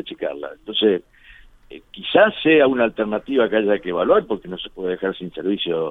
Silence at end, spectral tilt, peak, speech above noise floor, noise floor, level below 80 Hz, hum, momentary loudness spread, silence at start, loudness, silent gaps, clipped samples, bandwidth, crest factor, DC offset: 0 s; -7.5 dB/octave; -2 dBFS; 28 dB; -47 dBFS; -54 dBFS; none; 13 LU; 0.05 s; -19 LUFS; none; under 0.1%; 4.1 kHz; 18 dB; under 0.1%